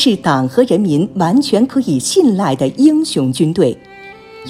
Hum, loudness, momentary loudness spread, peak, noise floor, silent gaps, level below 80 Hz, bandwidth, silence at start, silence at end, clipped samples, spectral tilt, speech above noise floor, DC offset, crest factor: none; -13 LUFS; 4 LU; 0 dBFS; -35 dBFS; none; -52 dBFS; 15 kHz; 0 s; 0 s; under 0.1%; -5.5 dB/octave; 22 dB; under 0.1%; 14 dB